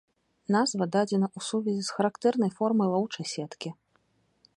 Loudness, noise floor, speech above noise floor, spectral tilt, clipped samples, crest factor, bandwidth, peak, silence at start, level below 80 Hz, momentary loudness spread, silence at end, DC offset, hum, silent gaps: -28 LUFS; -70 dBFS; 42 dB; -5.5 dB/octave; under 0.1%; 18 dB; 11 kHz; -10 dBFS; 0.5 s; -74 dBFS; 11 LU; 0.85 s; under 0.1%; none; none